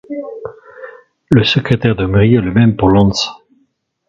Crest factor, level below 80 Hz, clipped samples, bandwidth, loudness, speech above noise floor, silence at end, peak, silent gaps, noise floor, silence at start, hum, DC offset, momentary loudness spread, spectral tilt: 14 dB; -34 dBFS; under 0.1%; 7.6 kHz; -12 LUFS; 50 dB; 0.7 s; 0 dBFS; none; -61 dBFS; 0.1 s; none; under 0.1%; 20 LU; -6.5 dB/octave